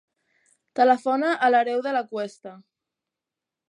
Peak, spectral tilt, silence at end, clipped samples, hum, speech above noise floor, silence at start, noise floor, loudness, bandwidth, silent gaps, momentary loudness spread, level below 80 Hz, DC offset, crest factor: -6 dBFS; -4.5 dB/octave; 1.1 s; under 0.1%; none; 65 dB; 0.75 s; -88 dBFS; -22 LUFS; 10.5 kHz; none; 15 LU; -84 dBFS; under 0.1%; 18 dB